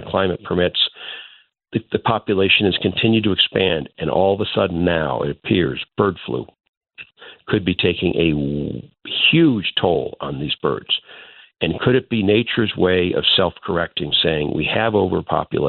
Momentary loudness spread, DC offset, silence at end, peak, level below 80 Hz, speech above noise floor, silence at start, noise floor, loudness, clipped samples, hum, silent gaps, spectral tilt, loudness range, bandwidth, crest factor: 11 LU; under 0.1%; 0 s; -2 dBFS; -46 dBFS; 29 dB; 0 s; -47 dBFS; -18 LUFS; under 0.1%; none; 6.69-6.81 s; -3.5 dB/octave; 4 LU; 4.5 kHz; 16 dB